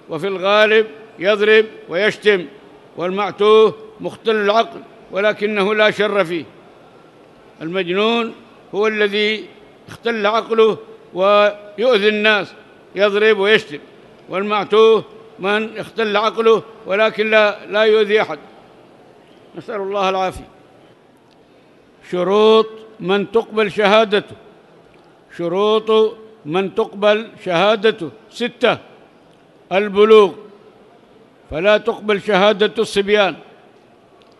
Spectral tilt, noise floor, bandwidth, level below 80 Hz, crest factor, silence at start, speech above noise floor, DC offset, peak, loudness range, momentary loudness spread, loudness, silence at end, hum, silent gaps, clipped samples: -5 dB/octave; -49 dBFS; 11.5 kHz; -56 dBFS; 18 dB; 0.1 s; 34 dB; under 0.1%; 0 dBFS; 4 LU; 14 LU; -16 LUFS; 1 s; none; none; under 0.1%